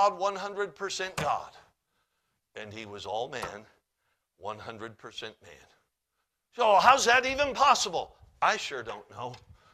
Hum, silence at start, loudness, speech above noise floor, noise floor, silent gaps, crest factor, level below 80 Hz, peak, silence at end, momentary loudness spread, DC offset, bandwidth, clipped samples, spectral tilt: none; 0 s; -27 LUFS; 53 dB; -82 dBFS; none; 24 dB; -64 dBFS; -6 dBFS; 0.35 s; 22 LU; under 0.1%; 15 kHz; under 0.1%; -2 dB/octave